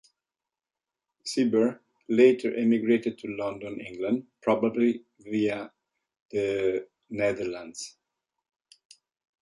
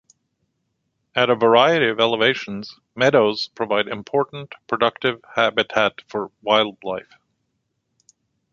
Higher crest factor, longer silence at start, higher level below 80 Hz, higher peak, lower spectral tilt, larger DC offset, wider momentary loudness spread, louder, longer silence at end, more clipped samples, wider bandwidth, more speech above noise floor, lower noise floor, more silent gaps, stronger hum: about the same, 20 dB vs 22 dB; about the same, 1.25 s vs 1.15 s; about the same, -68 dBFS vs -64 dBFS; second, -8 dBFS vs 0 dBFS; about the same, -5.5 dB/octave vs -5 dB/octave; neither; about the same, 16 LU vs 15 LU; second, -27 LUFS vs -20 LUFS; about the same, 1.5 s vs 1.5 s; neither; first, 11.5 kHz vs 7.4 kHz; first, over 64 dB vs 54 dB; first, under -90 dBFS vs -74 dBFS; first, 6.22-6.29 s vs none; neither